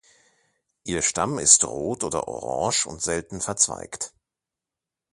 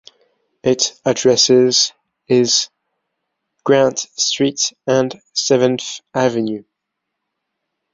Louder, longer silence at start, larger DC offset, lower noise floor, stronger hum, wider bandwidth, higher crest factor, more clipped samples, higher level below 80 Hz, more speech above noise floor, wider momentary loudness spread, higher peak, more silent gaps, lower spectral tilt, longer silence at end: second, -22 LUFS vs -16 LUFS; first, 0.85 s vs 0.65 s; neither; first, -88 dBFS vs -78 dBFS; neither; first, 11.5 kHz vs 7.8 kHz; first, 26 dB vs 16 dB; neither; first, -54 dBFS vs -60 dBFS; about the same, 64 dB vs 62 dB; first, 17 LU vs 12 LU; about the same, 0 dBFS vs -2 dBFS; neither; about the same, -2 dB/octave vs -3 dB/octave; second, 1.05 s vs 1.3 s